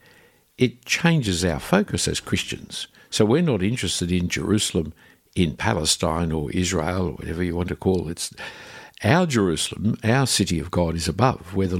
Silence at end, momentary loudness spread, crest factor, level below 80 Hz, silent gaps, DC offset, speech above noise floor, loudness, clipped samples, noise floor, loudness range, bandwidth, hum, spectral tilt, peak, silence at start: 0 s; 10 LU; 20 dB; -42 dBFS; none; under 0.1%; 33 dB; -23 LUFS; under 0.1%; -55 dBFS; 2 LU; 16.5 kHz; none; -4.5 dB/octave; -2 dBFS; 0.6 s